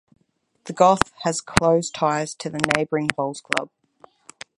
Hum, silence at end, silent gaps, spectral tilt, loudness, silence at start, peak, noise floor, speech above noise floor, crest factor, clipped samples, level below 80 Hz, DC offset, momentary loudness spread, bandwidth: none; 0.9 s; none; -4 dB/octave; -21 LUFS; 0.65 s; 0 dBFS; -61 dBFS; 39 dB; 24 dB; under 0.1%; -46 dBFS; under 0.1%; 16 LU; 16 kHz